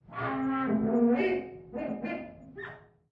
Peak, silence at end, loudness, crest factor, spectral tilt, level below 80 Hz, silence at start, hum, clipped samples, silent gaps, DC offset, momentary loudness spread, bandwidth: -16 dBFS; 0.35 s; -30 LUFS; 16 dB; -9 dB/octave; -62 dBFS; 0.1 s; none; under 0.1%; none; under 0.1%; 18 LU; 5.2 kHz